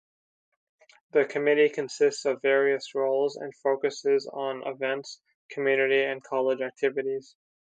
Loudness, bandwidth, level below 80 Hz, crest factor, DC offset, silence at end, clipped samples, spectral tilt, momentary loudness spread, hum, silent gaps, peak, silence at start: -27 LUFS; 9 kHz; -84 dBFS; 18 dB; under 0.1%; 0.6 s; under 0.1%; -4 dB/octave; 9 LU; none; 5.35-5.49 s; -10 dBFS; 1.15 s